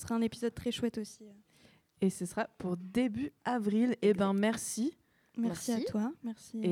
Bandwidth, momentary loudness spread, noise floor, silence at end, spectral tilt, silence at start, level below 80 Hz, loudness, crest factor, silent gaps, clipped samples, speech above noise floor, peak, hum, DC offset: 16 kHz; 11 LU; -65 dBFS; 0 s; -5.5 dB/octave; 0 s; -66 dBFS; -34 LUFS; 16 dB; none; under 0.1%; 32 dB; -16 dBFS; none; under 0.1%